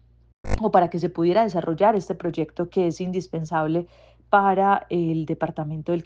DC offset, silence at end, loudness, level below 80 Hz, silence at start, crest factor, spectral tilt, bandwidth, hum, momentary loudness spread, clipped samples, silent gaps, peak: under 0.1%; 0.05 s; -23 LUFS; -42 dBFS; 0.45 s; 18 dB; -7.5 dB/octave; 8.2 kHz; none; 9 LU; under 0.1%; none; -4 dBFS